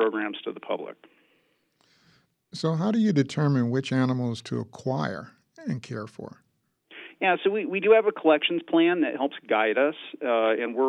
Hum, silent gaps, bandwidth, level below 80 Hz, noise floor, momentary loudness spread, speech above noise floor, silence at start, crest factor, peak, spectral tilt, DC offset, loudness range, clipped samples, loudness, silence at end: none; none; 10.5 kHz; -76 dBFS; -68 dBFS; 16 LU; 43 dB; 0 s; 18 dB; -8 dBFS; -7 dB/octave; under 0.1%; 7 LU; under 0.1%; -25 LUFS; 0 s